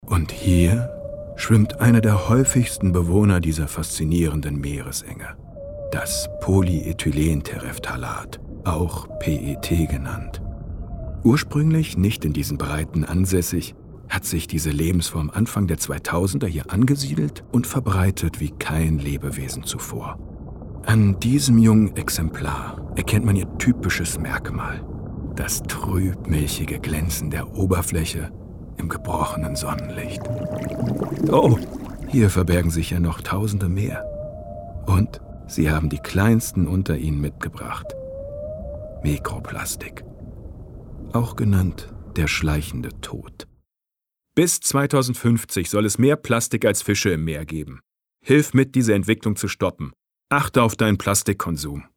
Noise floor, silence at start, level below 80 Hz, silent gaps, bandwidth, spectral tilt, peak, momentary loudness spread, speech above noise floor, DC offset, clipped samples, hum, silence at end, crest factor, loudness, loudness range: -87 dBFS; 0 s; -34 dBFS; none; 18 kHz; -5.5 dB/octave; -4 dBFS; 16 LU; 67 dB; under 0.1%; under 0.1%; none; 0.15 s; 18 dB; -22 LUFS; 6 LU